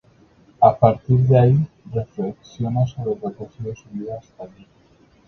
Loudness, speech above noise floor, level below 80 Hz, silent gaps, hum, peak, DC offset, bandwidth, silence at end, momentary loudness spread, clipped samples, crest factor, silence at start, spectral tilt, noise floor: -19 LUFS; 35 dB; -48 dBFS; none; none; 0 dBFS; under 0.1%; 6.4 kHz; 0.8 s; 18 LU; under 0.1%; 20 dB; 0.6 s; -10 dB/octave; -54 dBFS